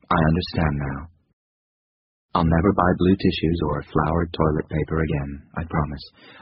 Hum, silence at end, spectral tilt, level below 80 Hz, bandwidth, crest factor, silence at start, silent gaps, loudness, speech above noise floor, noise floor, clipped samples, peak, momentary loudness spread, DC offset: none; 0.1 s; -6 dB/octave; -36 dBFS; 5.6 kHz; 20 dB; 0.1 s; 1.33-2.29 s; -22 LUFS; over 68 dB; under -90 dBFS; under 0.1%; -4 dBFS; 12 LU; under 0.1%